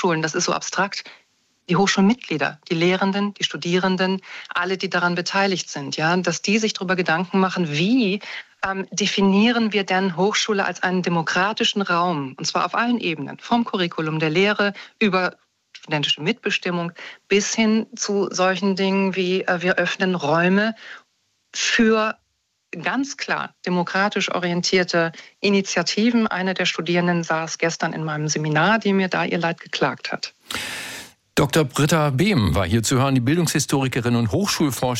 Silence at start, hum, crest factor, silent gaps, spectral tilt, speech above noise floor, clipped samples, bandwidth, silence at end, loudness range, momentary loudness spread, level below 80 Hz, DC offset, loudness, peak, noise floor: 0 s; none; 14 dB; none; -4.5 dB/octave; 50 dB; under 0.1%; 16 kHz; 0 s; 3 LU; 8 LU; -52 dBFS; under 0.1%; -21 LUFS; -8 dBFS; -71 dBFS